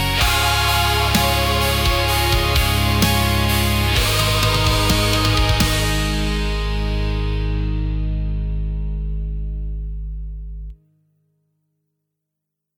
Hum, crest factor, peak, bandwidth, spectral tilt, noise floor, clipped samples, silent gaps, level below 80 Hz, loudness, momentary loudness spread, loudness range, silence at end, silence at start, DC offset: none; 16 dB; -4 dBFS; 19.5 kHz; -4 dB/octave; -80 dBFS; under 0.1%; none; -24 dBFS; -18 LUFS; 12 LU; 14 LU; 2.05 s; 0 s; under 0.1%